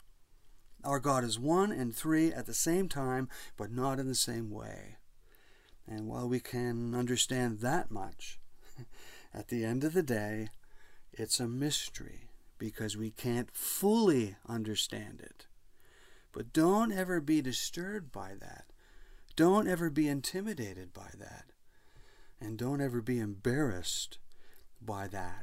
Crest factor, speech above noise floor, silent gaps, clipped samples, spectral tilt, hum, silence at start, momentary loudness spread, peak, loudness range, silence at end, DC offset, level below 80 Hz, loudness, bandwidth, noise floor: 20 dB; 26 dB; none; under 0.1%; -4.5 dB/octave; none; 0 s; 19 LU; -14 dBFS; 5 LU; 0 s; under 0.1%; -56 dBFS; -34 LUFS; 16 kHz; -59 dBFS